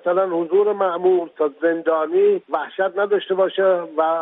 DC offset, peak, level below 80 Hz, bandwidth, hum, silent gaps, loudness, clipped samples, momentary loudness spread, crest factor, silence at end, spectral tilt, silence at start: under 0.1%; -6 dBFS; -78 dBFS; 3.9 kHz; none; none; -19 LUFS; under 0.1%; 5 LU; 12 dB; 0 s; -9 dB/octave; 0.05 s